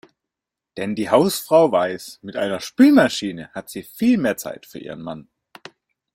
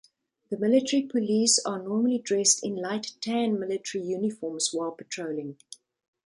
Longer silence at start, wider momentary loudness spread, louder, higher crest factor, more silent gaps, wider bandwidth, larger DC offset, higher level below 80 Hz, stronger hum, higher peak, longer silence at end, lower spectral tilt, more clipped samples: first, 0.75 s vs 0.5 s; first, 20 LU vs 12 LU; first, -18 LUFS vs -26 LUFS; about the same, 18 dB vs 20 dB; neither; first, 16.5 kHz vs 11.5 kHz; neither; first, -62 dBFS vs -76 dBFS; neither; first, -2 dBFS vs -8 dBFS; first, 0.95 s vs 0.5 s; first, -5 dB/octave vs -3 dB/octave; neither